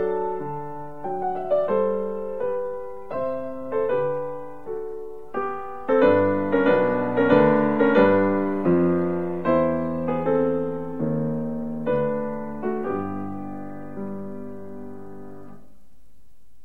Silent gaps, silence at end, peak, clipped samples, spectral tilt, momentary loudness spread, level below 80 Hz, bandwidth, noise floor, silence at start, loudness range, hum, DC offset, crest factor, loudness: none; 1.1 s; -4 dBFS; under 0.1%; -9.5 dB/octave; 17 LU; -54 dBFS; 4.6 kHz; -59 dBFS; 0 s; 12 LU; none; 1%; 20 dB; -23 LUFS